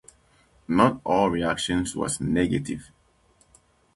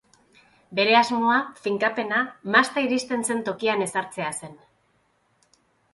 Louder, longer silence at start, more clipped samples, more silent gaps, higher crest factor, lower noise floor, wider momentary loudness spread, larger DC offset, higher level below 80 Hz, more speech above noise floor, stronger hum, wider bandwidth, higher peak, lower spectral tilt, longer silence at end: about the same, -24 LUFS vs -23 LUFS; about the same, 0.7 s vs 0.7 s; neither; neither; about the same, 22 dB vs 22 dB; second, -62 dBFS vs -67 dBFS; second, 8 LU vs 12 LU; neither; first, -48 dBFS vs -70 dBFS; second, 38 dB vs 43 dB; neither; about the same, 12 kHz vs 11.5 kHz; about the same, -4 dBFS vs -2 dBFS; first, -5 dB/octave vs -3 dB/octave; second, 1.1 s vs 1.4 s